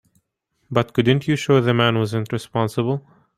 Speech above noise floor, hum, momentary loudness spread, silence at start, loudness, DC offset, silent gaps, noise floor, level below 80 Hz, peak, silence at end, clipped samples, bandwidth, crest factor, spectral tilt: 51 dB; none; 8 LU; 0.7 s; -20 LUFS; under 0.1%; none; -71 dBFS; -56 dBFS; -2 dBFS; 0.4 s; under 0.1%; 15 kHz; 18 dB; -6.5 dB/octave